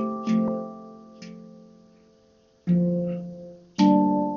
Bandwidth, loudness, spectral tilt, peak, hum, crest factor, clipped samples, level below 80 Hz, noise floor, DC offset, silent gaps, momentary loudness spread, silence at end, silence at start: 7 kHz; -24 LUFS; -8 dB/octave; -8 dBFS; none; 18 dB; under 0.1%; -62 dBFS; -59 dBFS; under 0.1%; none; 24 LU; 0 s; 0 s